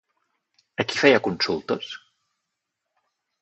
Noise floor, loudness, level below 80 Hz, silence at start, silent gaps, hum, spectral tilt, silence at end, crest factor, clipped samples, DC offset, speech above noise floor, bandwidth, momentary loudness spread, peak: -81 dBFS; -22 LUFS; -64 dBFS; 0.8 s; none; none; -4.5 dB/octave; 1.45 s; 24 dB; under 0.1%; under 0.1%; 59 dB; 8.4 kHz; 19 LU; -2 dBFS